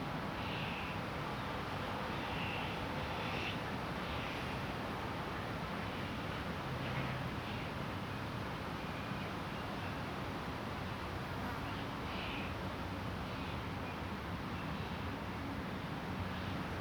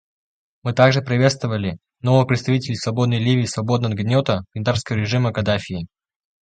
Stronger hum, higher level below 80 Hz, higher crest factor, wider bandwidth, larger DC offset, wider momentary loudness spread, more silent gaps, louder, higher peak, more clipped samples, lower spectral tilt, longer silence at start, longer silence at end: neither; second, -54 dBFS vs -46 dBFS; second, 14 dB vs 20 dB; first, over 20 kHz vs 9.2 kHz; neither; second, 3 LU vs 10 LU; neither; second, -41 LUFS vs -20 LUFS; second, -26 dBFS vs 0 dBFS; neither; about the same, -6 dB/octave vs -6 dB/octave; second, 0 s vs 0.65 s; second, 0 s vs 0.55 s